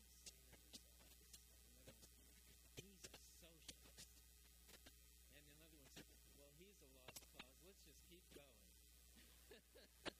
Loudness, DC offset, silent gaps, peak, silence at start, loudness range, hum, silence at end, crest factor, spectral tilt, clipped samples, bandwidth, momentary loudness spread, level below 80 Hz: -64 LUFS; under 0.1%; none; -38 dBFS; 0 s; 1 LU; none; 0 s; 28 dB; -2.5 dB/octave; under 0.1%; 15.5 kHz; 7 LU; -72 dBFS